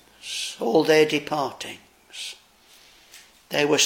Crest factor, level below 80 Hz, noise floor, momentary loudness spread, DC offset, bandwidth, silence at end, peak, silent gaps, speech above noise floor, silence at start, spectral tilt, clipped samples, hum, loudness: 20 dB; -70 dBFS; -54 dBFS; 20 LU; under 0.1%; 17 kHz; 0 s; -6 dBFS; none; 33 dB; 0.25 s; -2.5 dB/octave; under 0.1%; none; -23 LUFS